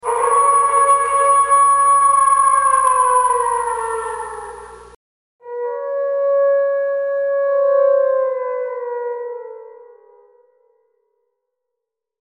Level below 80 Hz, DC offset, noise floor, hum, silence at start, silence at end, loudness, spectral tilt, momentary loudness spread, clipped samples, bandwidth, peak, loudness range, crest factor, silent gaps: -56 dBFS; under 0.1%; -81 dBFS; none; 0.05 s; 2.45 s; -15 LUFS; -0.5 dB/octave; 15 LU; under 0.1%; 11 kHz; -4 dBFS; 14 LU; 14 dB; 4.96-5.39 s